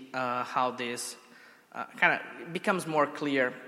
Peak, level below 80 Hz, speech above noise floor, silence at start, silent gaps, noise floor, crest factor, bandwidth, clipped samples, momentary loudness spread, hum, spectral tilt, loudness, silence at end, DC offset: -8 dBFS; -84 dBFS; 24 dB; 0 s; none; -54 dBFS; 22 dB; 16 kHz; under 0.1%; 15 LU; none; -4 dB/octave; -30 LUFS; 0 s; under 0.1%